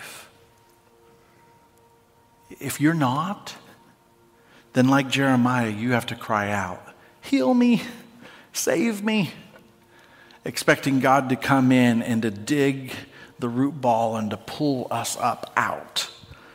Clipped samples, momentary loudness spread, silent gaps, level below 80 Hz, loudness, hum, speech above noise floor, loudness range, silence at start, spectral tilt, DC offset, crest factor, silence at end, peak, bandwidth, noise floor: under 0.1%; 16 LU; none; -64 dBFS; -23 LUFS; none; 35 dB; 7 LU; 0 s; -5 dB/octave; under 0.1%; 22 dB; 0.2 s; -2 dBFS; 16 kHz; -58 dBFS